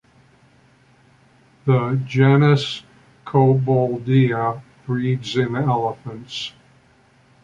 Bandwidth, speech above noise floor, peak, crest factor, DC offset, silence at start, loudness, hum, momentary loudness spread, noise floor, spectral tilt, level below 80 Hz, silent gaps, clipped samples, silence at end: 7.6 kHz; 37 dB; -2 dBFS; 18 dB; under 0.1%; 1.65 s; -19 LUFS; none; 15 LU; -55 dBFS; -7.5 dB/octave; -56 dBFS; none; under 0.1%; 0.95 s